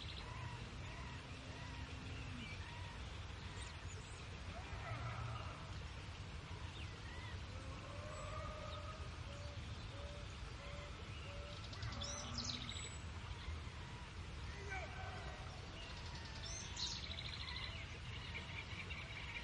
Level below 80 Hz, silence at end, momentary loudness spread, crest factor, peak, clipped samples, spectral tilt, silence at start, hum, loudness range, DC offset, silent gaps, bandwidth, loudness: -56 dBFS; 0 s; 6 LU; 18 dB; -30 dBFS; under 0.1%; -4 dB/octave; 0 s; none; 3 LU; under 0.1%; none; 11 kHz; -49 LUFS